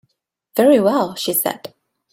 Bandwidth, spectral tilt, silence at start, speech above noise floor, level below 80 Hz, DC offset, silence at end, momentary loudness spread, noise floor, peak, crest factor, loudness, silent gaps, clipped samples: 16.5 kHz; -4 dB/octave; 0.55 s; 53 dB; -64 dBFS; under 0.1%; 0.45 s; 11 LU; -69 dBFS; -2 dBFS; 16 dB; -17 LUFS; none; under 0.1%